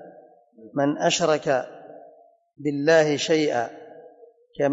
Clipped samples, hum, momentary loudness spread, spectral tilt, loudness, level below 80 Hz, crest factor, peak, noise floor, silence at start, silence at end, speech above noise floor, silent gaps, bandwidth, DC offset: under 0.1%; none; 21 LU; -4 dB/octave; -23 LUFS; -70 dBFS; 16 dB; -8 dBFS; -53 dBFS; 0 s; 0 s; 31 dB; none; 8 kHz; under 0.1%